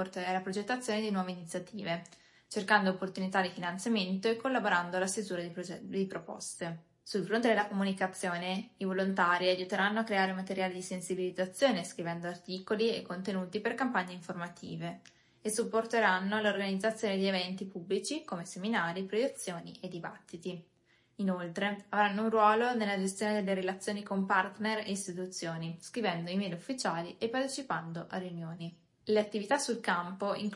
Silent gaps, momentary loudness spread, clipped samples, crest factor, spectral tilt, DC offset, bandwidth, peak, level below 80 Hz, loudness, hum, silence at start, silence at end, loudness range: none; 13 LU; under 0.1%; 22 dB; -4.5 dB/octave; under 0.1%; 11.5 kHz; -12 dBFS; -80 dBFS; -33 LUFS; none; 0 s; 0 s; 5 LU